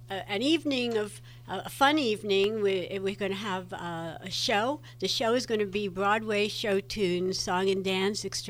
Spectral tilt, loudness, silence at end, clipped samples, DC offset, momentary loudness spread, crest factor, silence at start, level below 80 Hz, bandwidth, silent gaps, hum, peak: -4 dB/octave; -29 LUFS; 0 s; under 0.1%; under 0.1%; 10 LU; 20 dB; 0 s; -58 dBFS; 16 kHz; none; none; -10 dBFS